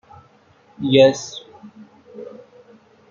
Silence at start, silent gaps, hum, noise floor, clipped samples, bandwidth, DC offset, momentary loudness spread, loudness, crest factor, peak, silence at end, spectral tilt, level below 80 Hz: 0.8 s; none; none; -54 dBFS; under 0.1%; 7.6 kHz; under 0.1%; 25 LU; -16 LUFS; 20 dB; -2 dBFS; 0.85 s; -5 dB/octave; -66 dBFS